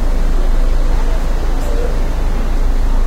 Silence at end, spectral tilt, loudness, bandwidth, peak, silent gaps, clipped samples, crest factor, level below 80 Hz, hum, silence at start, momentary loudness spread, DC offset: 0 s; -6 dB/octave; -20 LUFS; 8.6 kHz; -4 dBFS; none; under 0.1%; 8 dB; -12 dBFS; none; 0 s; 2 LU; under 0.1%